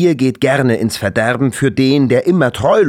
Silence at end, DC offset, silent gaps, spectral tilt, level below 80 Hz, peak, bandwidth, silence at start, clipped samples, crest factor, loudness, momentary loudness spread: 0 s; under 0.1%; none; -6 dB/octave; -48 dBFS; -2 dBFS; 15.5 kHz; 0 s; under 0.1%; 10 dB; -14 LUFS; 3 LU